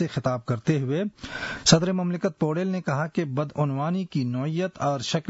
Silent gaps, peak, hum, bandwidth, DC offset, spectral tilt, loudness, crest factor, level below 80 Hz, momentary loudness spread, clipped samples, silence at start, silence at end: none; -6 dBFS; none; 8 kHz; under 0.1%; -5 dB/octave; -26 LUFS; 20 dB; -56 dBFS; 8 LU; under 0.1%; 0 s; 0 s